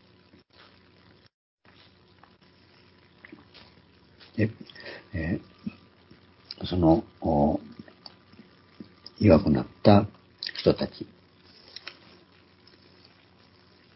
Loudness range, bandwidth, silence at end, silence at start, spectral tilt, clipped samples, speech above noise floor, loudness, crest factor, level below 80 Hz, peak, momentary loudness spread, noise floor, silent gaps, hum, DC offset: 13 LU; 5.8 kHz; 2.9 s; 4.35 s; -11 dB/octave; under 0.1%; 36 dB; -25 LUFS; 26 dB; -46 dBFS; -2 dBFS; 27 LU; -58 dBFS; none; none; under 0.1%